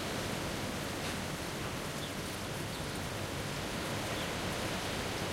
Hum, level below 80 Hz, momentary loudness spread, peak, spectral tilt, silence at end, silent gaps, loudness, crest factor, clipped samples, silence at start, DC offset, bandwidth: none; -52 dBFS; 3 LU; -24 dBFS; -4 dB/octave; 0 s; none; -37 LUFS; 14 dB; under 0.1%; 0 s; under 0.1%; 16 kHz